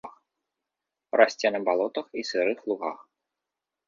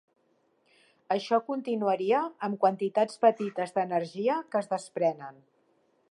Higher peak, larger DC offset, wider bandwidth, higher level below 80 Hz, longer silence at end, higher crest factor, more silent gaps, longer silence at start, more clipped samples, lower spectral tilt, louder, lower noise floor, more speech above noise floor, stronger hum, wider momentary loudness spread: first, -4 dBFS vs -10 dBFS; neither; second, 7.6 kHz vs 11.5 kHz; first, -78 dBFS vs -86 dBFS; about the same, 0.9 s vs 0.8 s; about the same, 24 dB vs 20 dB; neither; second, 0.05 s vs 1.1 s; neither; second, -3.5 dB/octave vs -6 dB/octave; first, -26 LUFS vs -29 LUFS; first, -87 dBFS vs -70 dBFS; first, 62 dB vs 42 dB; neither; first, 13 LU vs 8 LU